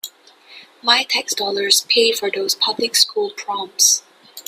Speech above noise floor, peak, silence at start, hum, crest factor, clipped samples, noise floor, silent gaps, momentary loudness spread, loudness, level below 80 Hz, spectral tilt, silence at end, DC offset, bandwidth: 28 dB; 0 dBFS; 0.05 s; none; 20 dB; under 0.1%; -46 dBFS; none; 10 LU; -16 LUFS; -70 dBFS; 1 dB/octave; 0.05 s; under 0.1%; 16 kHz